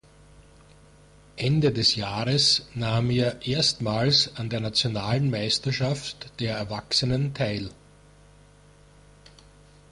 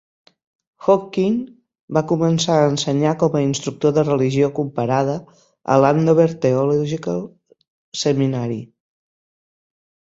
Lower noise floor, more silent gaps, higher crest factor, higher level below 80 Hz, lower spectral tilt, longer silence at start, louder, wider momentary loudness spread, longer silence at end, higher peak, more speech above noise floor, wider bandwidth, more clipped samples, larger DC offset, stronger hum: second, -54 dBFS vs under -90 dBFS; second, none vs 1.80-1.88 s, 7.68-7.92 s; about the same, 18 dB vs 18 dB; first, -52 dBFS vs -58 dBFS; second, -4.5 dB/octave vs -6 dB/octave; first, 1.35 s vs 0.8 s; second, -24 LUFS vs -19 LUFS; about the same, 10 LU vs 11 LU; first, 2.2 s vs 1.5 s; second, -8 dBFS vs -2 dBFS; second, 29 dB vs over 72 dB; first, 11.5 kHz vs 8 kHz; neither; neither; first, 50 Hz at -50 dBFS vs none